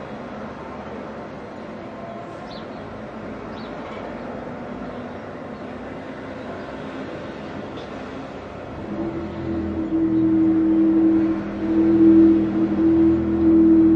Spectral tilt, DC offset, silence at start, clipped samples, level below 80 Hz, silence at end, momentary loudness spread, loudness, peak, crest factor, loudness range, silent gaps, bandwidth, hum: -9 dB/octave; under 0.1%; 0 s; under 0.1%; -48 dBFS; 0 s; 19 LU; -19 LUFS; -6 dBFS; 16 dB; 17 LU; none; 5.4 kHz; none